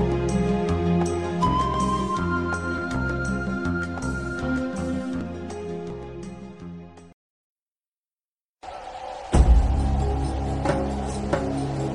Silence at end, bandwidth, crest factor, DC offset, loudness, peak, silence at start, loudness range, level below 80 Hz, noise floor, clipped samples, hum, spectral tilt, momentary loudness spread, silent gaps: 0 s; 10.5 kHz; 20 dB; under 0.1%; -25 LUFS; -6 dBFS; 0 s; 14 LU; -30 dBFS; under -90 dBFS; under 0.1%; none; -7 dB/octave; 15 LU; 7.14-7.75 s, 7.87-8.03 s, 8.13-8.18 s, 8.25-8.54 s